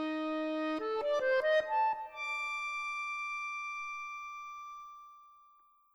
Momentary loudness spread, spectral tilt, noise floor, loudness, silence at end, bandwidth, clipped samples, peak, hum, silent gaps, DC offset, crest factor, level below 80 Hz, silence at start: 16 LU; -2.5 dB/octave; -65 dBFS; -35 LUFS; 0.6 s; over 20 kHz; under 0.1%; -20 dBFS; none; none; under 0.1%; 16 dB; -76 dBFS; 0 s